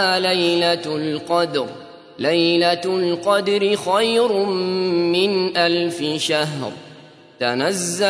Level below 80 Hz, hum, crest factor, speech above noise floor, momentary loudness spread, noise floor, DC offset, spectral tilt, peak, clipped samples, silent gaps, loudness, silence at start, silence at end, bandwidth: -70 dBFS; none; 16 dB; 25 dB; 8 LU; -44 dBFS; under 0.1%; -4 dB/octave; -2 dBFS; under 0.1%; none; -19 LUFS; 0 s; 0 s; 11 kHz